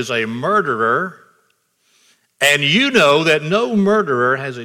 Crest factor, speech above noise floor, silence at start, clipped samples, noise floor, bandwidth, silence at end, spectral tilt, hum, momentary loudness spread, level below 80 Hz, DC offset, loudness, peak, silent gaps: 16 dB; 47 dB; 0 s; under 0.1%; -62 dBFS; 18 kHz; 0 s; -4 dB/octave; none; 7 LU; -62 dBFS; under 0.1%; -15 LUFS; 0 dBFS; none